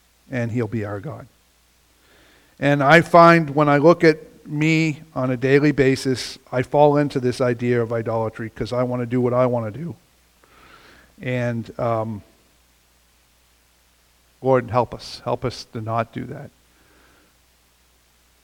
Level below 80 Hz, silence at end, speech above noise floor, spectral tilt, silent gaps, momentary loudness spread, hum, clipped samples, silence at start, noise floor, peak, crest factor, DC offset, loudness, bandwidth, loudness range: -54 dBFS; 1.95 s; 40 dB; -6.5 dB/octave; none; 17 LU; none; under 0.1%; 0.3 s; -59 dBFS; 0 dBFS; 22 dB; under 0.1%; -19 LUFS; 16.5 kHz; 13 LU